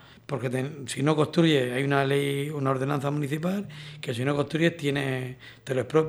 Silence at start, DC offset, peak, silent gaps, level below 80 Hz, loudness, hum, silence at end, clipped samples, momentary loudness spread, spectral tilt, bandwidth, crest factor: 0.05 s; under 0.1%; -8 dBFS; none; -64 dBFS; -27 LUFS; none; 0 s; under 0.1%; 11 LU; -6 dB/octave; 14.5 kHz; 18 dB